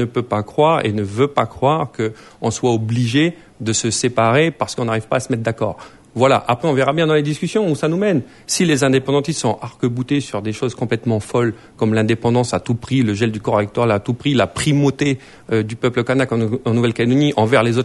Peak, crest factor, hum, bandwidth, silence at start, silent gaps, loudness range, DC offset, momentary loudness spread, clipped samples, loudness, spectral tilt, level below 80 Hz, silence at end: -2 dBFS; 16 dB; none; 11.5 kHz; 0 s; none; 2 LU; under 0.1%; 7 LU; under 0.1%; -18 LUFS; -5.5 dB/octave; -50 dBFS; 0 s